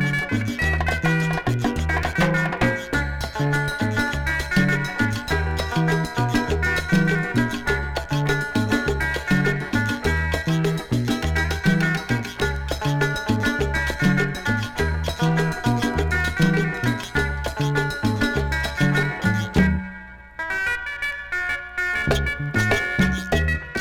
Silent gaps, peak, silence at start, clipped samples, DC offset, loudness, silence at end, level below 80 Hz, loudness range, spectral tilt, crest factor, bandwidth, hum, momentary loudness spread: none; -4 dBFS; 0 s; under 0.1%; under 0.1%; -22 LUFS; 0 s; -32 dBFS; 1 LU; -5.5 dB/octave; 18 dB; 17 kHz; none; 5 LU